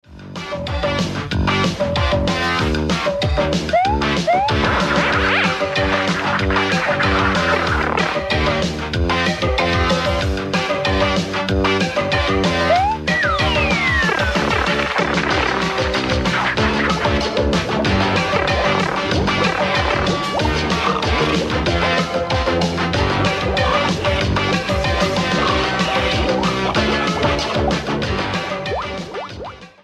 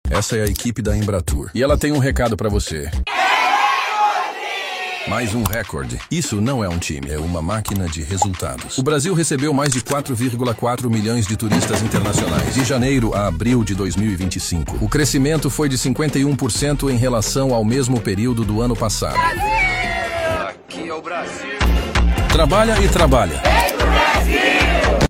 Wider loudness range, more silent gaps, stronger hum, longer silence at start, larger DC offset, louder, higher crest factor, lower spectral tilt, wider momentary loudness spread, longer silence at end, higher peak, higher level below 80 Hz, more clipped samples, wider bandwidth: about the same, 2 LU vs 4 LU; neither; neither; about the same, 0.1 s vs 0.05 s; neither; about the same, -17 LUFS vs -18 LUFS; about the same, 14 dB vs 16 dB; about the same, -5 dB/octave vs -4.5 dB/octave; second, 4 LU vs 9 LU; first, 0.15 s vs 0 s; about the same, -4 dBFS vs -2 dBFS; about the same, -30 dBFS vs -26 dBFS; neither; second, 12.5 kHz vs 16 kHz